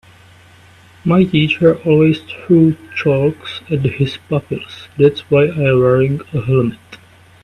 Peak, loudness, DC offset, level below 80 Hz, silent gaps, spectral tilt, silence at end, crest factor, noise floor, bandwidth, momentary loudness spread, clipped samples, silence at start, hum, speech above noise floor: 0 dBFS; -15 LUFS; under 0.1%; -46 dBFS; none; -8.5 dB/octave; 0.5 s; 14 dB; -44 dBFS; 10.5 kHz; 10 LU; under 0.1%; 1.05 s; none; 30 dB